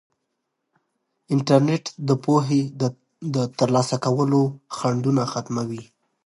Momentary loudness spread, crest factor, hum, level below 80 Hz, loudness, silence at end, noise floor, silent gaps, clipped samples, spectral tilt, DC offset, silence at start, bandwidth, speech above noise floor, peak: 9 LU; 20 dB; none; -66 dBFS; -22 LUFS; 0.45 s; -78 dBFS; none; under 0.1%; -6.5 dB/octave; under 0.1%; 1.3 s; 11.5 kHz; 56 dB; -2 dBFS